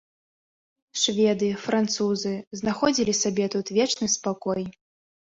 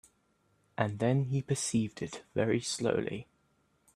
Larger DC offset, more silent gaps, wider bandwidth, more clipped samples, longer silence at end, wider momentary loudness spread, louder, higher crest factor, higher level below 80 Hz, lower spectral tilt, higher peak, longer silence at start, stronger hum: neither; first, 2.47-2.51 s vs none; second, 8 kHz vs 13 kHz; neither; second, 0.6 s vs 0.75 s; second, 8 LU vs 11 LU; first, -25 LUFS vs -32 LUFS; about the same, 18 dB vs 20 dB; about the same, -62 dBFS vs -66 dBFS; second, -3.5 dB/octave vs -5.5 dB/octave; first, -8 dBFS vs -12 dBFS; first, 0.95 s vs 0.8 s; neither